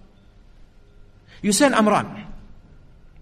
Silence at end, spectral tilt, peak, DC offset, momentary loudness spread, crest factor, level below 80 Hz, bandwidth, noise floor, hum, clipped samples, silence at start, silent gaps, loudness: 0.75 s; -4 dB/octave; -4 dBFS; under 0.1%; 22 LU; 20 dB; -46 dBFS; 13 kHz; -49 dBFS; none; under 0.1%; 1.4 s; none; -19 LUFS